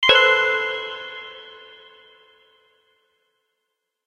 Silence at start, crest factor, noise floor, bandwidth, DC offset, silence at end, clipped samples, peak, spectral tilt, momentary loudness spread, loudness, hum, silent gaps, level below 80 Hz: 0 s; 24 dB; -79 dBFS; 11 kHz; under 0.1%; 2.5 s; under 0.1%; 0 dBFS; -1 dB/octave; 27 LU; -18 LUFS; none; none; -60 dBFS